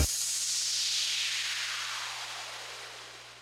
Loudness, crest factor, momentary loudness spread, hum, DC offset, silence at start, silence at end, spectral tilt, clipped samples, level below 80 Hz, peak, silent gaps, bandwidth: -30 LUFS; 20 dB; 14 LU; 60 Hz at -65 dBFS; under 0.1%; 0 s; 0 s; 0.5 dB/octave; under 0.1%; -48 dBFS; -14 dBFS; none; 16 kHz